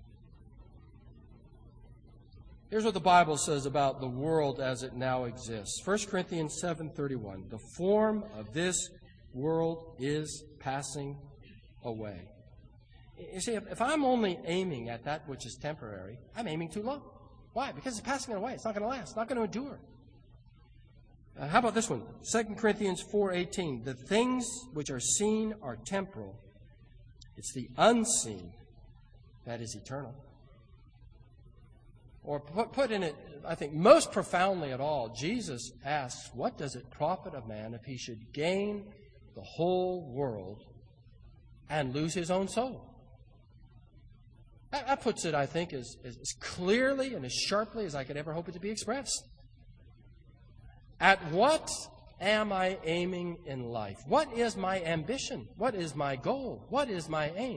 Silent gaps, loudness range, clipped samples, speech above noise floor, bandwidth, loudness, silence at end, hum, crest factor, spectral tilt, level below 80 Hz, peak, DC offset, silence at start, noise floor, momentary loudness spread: none; 8 LU; under 0.1%; 25 dB; 10.5 kHz; -32 LUFS; 0 s; none; 26 dB; -4 dB/octave; -58 dBFS; -6 dBFS; under 0.1%; 0 s; -58 dBFS; 15 LU